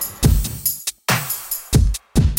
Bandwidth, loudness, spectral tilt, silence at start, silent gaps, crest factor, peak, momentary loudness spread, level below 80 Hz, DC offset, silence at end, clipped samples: 17 kHz; -20 LUFS; -4.5 dB/octave; 0 s; none; 14 dB; -4 dBFS; 5 LU; -22 dBFS; under 0.1%; 0 s; under 0.1%